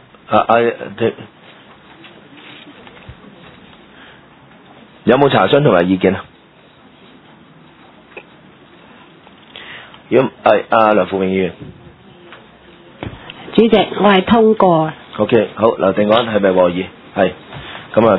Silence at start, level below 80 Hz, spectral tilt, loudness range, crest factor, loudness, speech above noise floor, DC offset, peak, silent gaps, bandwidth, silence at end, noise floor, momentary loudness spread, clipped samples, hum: 0.3 s; -50 dBFS; -9.5 dB/octave; 10 LU; 16 dB; -14 LUFS; 33 dB; under 0.1%; 0 dBFS; none; 5.4 kHz; 0 s; -45 dBFS; 22 LU; under 0.1%; none